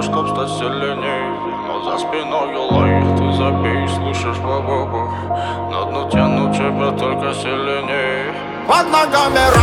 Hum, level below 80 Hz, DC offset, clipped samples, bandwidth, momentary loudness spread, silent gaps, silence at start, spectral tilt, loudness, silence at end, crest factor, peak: none; -38 dBFS; under 0.1%; under 0.1%; 16.5 kHz; 8 LU; none; 0 s; -5.5 dB/octave; -17 LUFS; 0 s; 16 dB; 0 dBFS